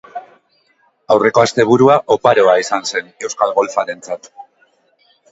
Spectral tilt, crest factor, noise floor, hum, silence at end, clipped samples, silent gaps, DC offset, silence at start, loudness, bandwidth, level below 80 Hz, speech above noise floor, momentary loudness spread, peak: -4.5 dB/octave; 16 dB; -58 dBFS; none; 0.9 s; under 0.1%; none; under 0.1%; 0.15 s; -14 LUFS; 8 kHz; -56 dBFS; 45 dB; 16 LU; 0 dBFS